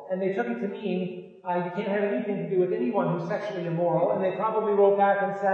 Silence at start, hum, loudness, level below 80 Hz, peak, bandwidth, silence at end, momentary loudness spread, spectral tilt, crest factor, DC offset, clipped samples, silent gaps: 0 s; none; -26 LUFS; -86 dBFS; -10 dBFS; 6.8 kHz; 0 s; 9 LU; -8.5 dB/octave; 16 dB; under 0.1%; under 0.1%; none